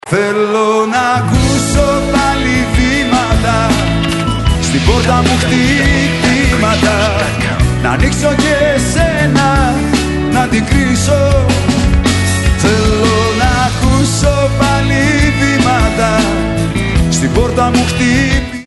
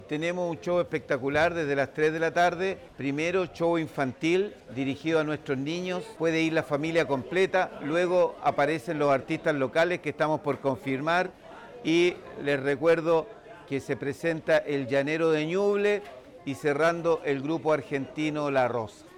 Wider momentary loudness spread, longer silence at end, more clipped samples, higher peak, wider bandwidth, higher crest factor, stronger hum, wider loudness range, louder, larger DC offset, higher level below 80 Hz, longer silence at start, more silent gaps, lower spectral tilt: second, 3 LU vs 8 LU; about the same, 0 s vs 0 s; neither; first, 0 dBFS vs -14 dBFS; second, 12 kHz vs 14 kHz; about the same, 10 dB vs 12 dB; neither; about the same, 1 LU vs 2 LU; first, -11 LUFS vs -27 LUFS; neither; first, -20 dBFS vs -64 dBFS; about the same, 0.05 s vs 0 s; neither; about the same, -5 dB/octave vs -6 dB/octave